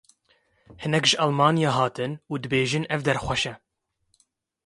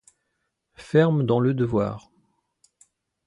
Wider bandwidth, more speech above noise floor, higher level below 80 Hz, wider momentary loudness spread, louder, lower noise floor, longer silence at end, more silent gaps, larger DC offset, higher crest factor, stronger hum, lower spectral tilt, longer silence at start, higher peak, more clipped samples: about the same, 11.5 kHz vs 11 kHz; second, 48 dB vs 56 dB; about the same, -54 dBFS vs -56 dBFS; about the same, 10 LU vs 9 LU; about the same, -23 LUFS vs -22 LUFS; second, -72 dBFS vs -77 dBFS; second, 1.1 s vs 1.3 s; neither; neither; about the same, 22 dB vs 20 dB; neither; second, -4.5 dB/octave vs -8.5 dB/octave; about the same, 0.7 s vs 0.8 s; about the same, -4 dBFS vs -6 dBFS; neither